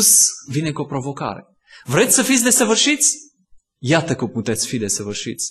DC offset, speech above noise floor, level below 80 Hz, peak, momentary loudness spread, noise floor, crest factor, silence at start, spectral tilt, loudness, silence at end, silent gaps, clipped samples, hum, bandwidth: under 0.1%; 34 dB; -56 dBFS; -2 dBFS; 14 LU; -52 dBFS; 18 dB; 0 s; -2.5 dB/octave; -17 LUFS; 0 s; none; under 0.1%; none; 13 kHz